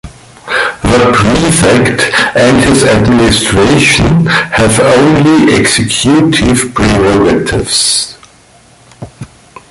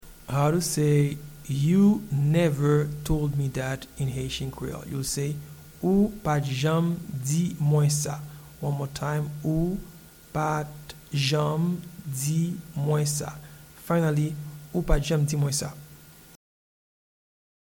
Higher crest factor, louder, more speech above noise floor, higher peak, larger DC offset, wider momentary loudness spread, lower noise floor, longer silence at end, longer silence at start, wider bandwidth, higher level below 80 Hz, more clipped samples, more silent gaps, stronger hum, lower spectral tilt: second, 8 dB vs 18 dB; first, -7 LUFS vs -26 LUFS; first, 34 dB vs 24 dB; first, 0 dBFS vs -8 dBFS; neither; second, 5 LU vs 13 LU; second, -41 dBFS vs -49 dBFS; second, 0.45 s vs 1.5 s; about the same, 0.05 s vs 0.05 s; second, 12 kHz vs 19 kHz; first, -26 dBFS vs -42 dBFS; neither; neither; neither; second, -4.5 dB/octave vs -6 dB/octave